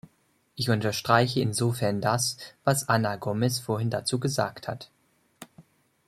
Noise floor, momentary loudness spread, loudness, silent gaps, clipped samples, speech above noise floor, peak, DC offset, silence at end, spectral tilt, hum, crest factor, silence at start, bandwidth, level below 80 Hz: -68 dBFS; 9 LU; -27 LUFS; none; under 0.1%; 41 dB; -4 dBFS; under 0.1%; 0.45 s; -4.5 dB/octave; none; 24 dB; 0.55 s; 15 kHz; -64 dBFS